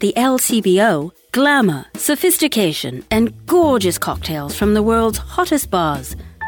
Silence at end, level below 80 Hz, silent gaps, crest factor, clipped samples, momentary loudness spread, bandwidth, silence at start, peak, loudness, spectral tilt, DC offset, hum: 0 s; -38 dBFS; none; 14 dB; under 0.1%; 9 LU; 19.5 kHz; 0 s; -4 dBFS; -16 LUFS; -4 dB/octave; under 0.1%; none